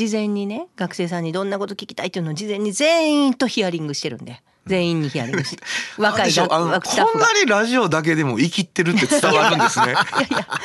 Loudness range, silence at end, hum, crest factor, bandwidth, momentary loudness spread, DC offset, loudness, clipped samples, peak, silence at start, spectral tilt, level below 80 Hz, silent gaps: 5 LU; 0 s; none; 18 dB; 12.5 kHz; 11 LU; under 0.1%; -19 LUFS; under 0.1%; -2 dBFS; 0 s; -4 dB/octave; -60 dBFS; none